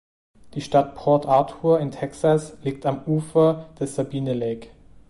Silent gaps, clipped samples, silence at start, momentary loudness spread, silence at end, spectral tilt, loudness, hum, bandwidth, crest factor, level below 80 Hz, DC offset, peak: none; under 0.1%; 0.45 s; 11 LU; 0.4 s; -7.5 dB/octave; -22 LUFS; none; 11.5 kHz; 18 dB; -54 dBFS; under 0.1%; -4 dBFS